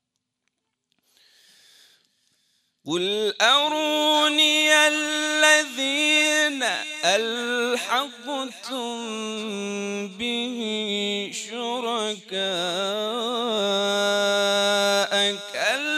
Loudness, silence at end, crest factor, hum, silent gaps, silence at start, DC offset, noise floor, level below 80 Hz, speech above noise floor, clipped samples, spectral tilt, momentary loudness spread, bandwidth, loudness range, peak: -22 LUFS; 0 s; 20 dB; none; none; 2.85 s; under 0.1%; -78 dBFS; -76 dBFS; 55 dB; under 0.1%; -1.5 dB/octave; 13 LU; 15.5 kHz; 9 LU; -4 dBFS